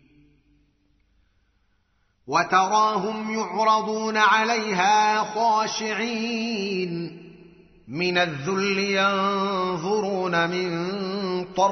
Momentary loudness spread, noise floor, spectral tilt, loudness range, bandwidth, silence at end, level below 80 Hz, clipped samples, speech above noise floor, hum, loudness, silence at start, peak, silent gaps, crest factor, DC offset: 9 LU; -67 dBFS; -2.5 dB/octave; 5 LU; 6.4 kHz; 0 s; -66 dBFS; under 0.1%; 44 dB; none; -23 LUFS; 2.25 s; -6 dBFS; none; 18 dB; under 0.1%